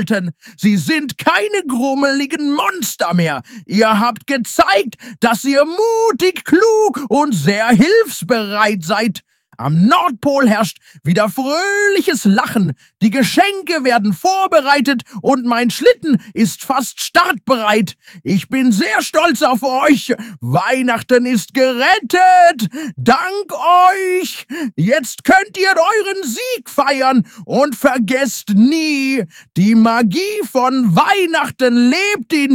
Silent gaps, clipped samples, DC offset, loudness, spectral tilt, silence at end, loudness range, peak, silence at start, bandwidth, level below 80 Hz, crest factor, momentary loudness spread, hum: none; under 0.1%; under 0.1%; -14 LUFS; -5 dB/octave; 0 s; 2 LU; 0 dBFS; 0 s; 17 kHz; -56 dBFS; 14 dB; 7 LU; none